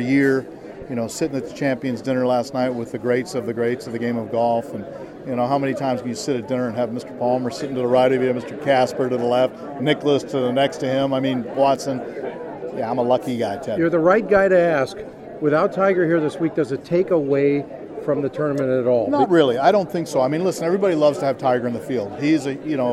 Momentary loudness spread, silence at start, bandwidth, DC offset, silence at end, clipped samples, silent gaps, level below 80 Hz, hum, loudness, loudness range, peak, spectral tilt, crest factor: 10 LU; 0 s; 13.5 kHz; under 0.1%; 0 s; under 0.1%; none; -58 dBFS; none; -20 LUFS; 5 LU; -2 dBFS; -6 dB/octave; 18 dB